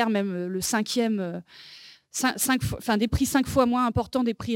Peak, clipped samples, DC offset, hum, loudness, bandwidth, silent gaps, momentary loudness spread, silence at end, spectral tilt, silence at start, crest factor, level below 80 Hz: -6 dBFS; under 0.1%; under 0.1%; none; -25 LUFS; 17 kHz; none; 12 LU; 0 s; -4.5 dB/octave; 0 s; 18 dB; -46 dBFS